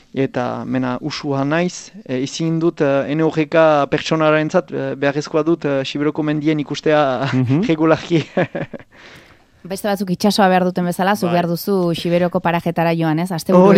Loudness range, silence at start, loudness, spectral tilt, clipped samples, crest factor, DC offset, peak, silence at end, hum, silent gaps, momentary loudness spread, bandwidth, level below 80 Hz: 3 LU; 0.15 s; -17 LUFS; -6.5 dB/octave; under 0.1%; 16 dB; under 0.1%; 0 dBFS; 0 s; none; none; 9 LU; 16 kHz; -56 dBFS